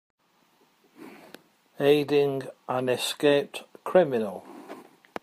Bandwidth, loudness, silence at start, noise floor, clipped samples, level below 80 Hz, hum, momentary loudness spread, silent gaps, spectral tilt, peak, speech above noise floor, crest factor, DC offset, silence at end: 15.5 kHz; -25 LUFS; 1 s; -65 dBFS; under 0.1%; -76 dBFS; none; 23 LU; none; -5 dB/octave; -8 dBFS; 40 dB; 20 dB; under 0.1%; 0.4 s